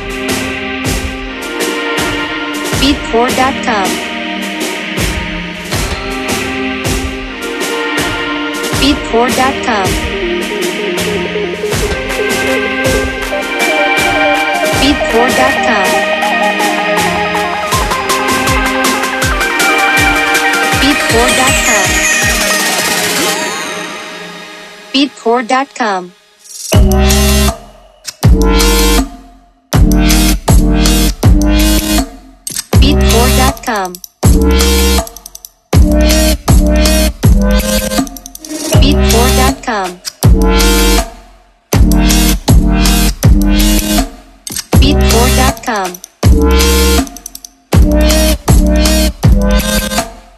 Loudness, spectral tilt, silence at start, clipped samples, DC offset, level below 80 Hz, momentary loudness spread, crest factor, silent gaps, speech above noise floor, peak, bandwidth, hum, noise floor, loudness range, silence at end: -11 LUFS; -4 dB/octave; 0 s; under 0.1%; under 0.1%; -16 dBFS; 9 LU; 10 dB; none; 30 dB; 0 dBFS; 14.5 kHz; none; -41 dBFS; 5 LU; 0.2 s